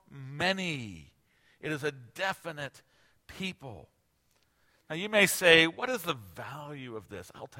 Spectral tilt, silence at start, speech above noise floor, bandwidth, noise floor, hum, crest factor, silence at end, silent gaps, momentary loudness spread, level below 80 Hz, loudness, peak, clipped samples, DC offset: -3 dB/octave; 0.1 s; 41 dB; 16.5 kHz; -72 dBFS; none; 28 dB; 0 s; none; 23 LU; -66 dBFS; -28 LUFS; -4 dBFS; under 0.1%; under 0.1%